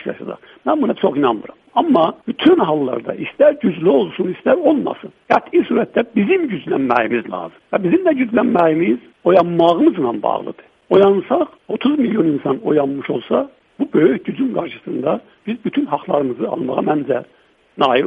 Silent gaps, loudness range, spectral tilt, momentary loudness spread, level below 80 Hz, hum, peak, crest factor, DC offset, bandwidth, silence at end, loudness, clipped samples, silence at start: none; 4 LU; -8.5 dB/octave; 11 LU; -60 dBFS; none; 0 dBFS; 16 dB; under 0.1%; 5.4 kHz; 0 s; -17 LUFS; under 0.1%; 0 s